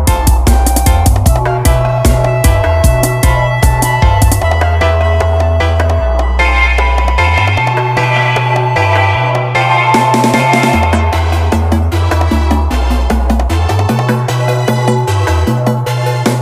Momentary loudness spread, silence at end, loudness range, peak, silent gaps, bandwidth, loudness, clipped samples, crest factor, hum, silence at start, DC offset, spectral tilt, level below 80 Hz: 3 LU; 0 s; 2 LU; 0 dBFS; none; 16 kHz; -11 LUFS; 0.1%; 10 dB; none; 0 s; under 0.1%; -5.5 dB/octave; -14 dBFS